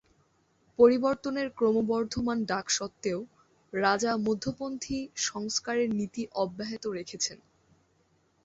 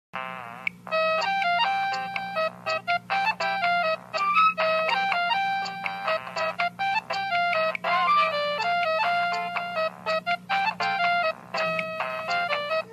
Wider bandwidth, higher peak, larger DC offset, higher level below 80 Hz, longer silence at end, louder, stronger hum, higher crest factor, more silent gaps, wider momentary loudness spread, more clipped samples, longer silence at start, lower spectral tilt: second, 8 kHz vs 14 kHz; about the same, -8 dBFS vs -10 dBFS; neither; first, -60 dBFS vs -72 dBFS; first, 1.1 s vs 0 s; second, -29 LUFS vs -25 LUFS; second, none vs 60 Hz at -55 dBFS; first, 22 dB vs 16 dB; neither; first, 12 LU vs 8 LU; neither; first, 0.8 s vs 0.15 s; about the same, -3.5 dB/octave vs -3.5 dB/octave